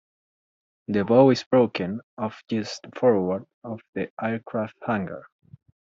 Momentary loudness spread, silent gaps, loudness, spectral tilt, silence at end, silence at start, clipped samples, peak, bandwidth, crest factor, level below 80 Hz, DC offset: 17 LU; 1.46-1.51 s, 2.03-2.17 s, 3.54-3.62 s, 3.88-3.93 s, 4.10-4.17 s; -24 LUFS; -6 dB/octave; 0.65 s; 0.9 s; under 0.1%; -6 dBFS; 7.6 kHz; 20 dB; -66 dBFS; under 0.1%